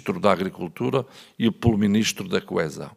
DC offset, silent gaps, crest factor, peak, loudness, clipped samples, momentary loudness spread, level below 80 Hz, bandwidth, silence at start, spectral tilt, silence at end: under 0.1%; none; 22 dB; -2 dBFS; -23 LUFS; under 0.1%; 8 LU; -48 dBFS; 15.5 kHz; 0.05 s; -5.5 dB/octave; 0.05 s